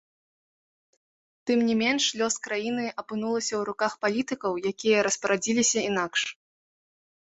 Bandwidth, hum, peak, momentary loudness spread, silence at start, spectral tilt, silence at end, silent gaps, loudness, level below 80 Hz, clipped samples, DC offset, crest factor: 8.4 kHz; none; -8 dBFS; 7 LU; 1.45 s; -2.5 dB/octave; 0.9 s; none; -26 LUFS; -70 dBFS; under 0.1%; under 0.1%; 18 dB